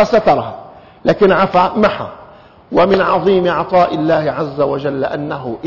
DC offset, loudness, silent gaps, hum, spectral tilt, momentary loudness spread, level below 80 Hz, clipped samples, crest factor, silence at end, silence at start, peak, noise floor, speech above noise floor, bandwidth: under 0.1%; -14 LUFS; none; none; -7.5 dB/octave; 10 LU; -44 dBFS; under 0.1%; 12 dB; 0 s; 0 s; -2 dBFS; -40 dBFS; 27 dB; 6 kHz